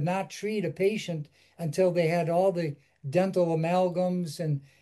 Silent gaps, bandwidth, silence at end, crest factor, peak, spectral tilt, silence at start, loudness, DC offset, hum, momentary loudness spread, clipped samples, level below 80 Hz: none; 12.5 kHz; 0.15 s; 14 dB; -12 dBFS; -7 dB/octave; 0 s; -28 LUFS; under 0.1%; none; 11 LU; under 0.1%; -72 dBFS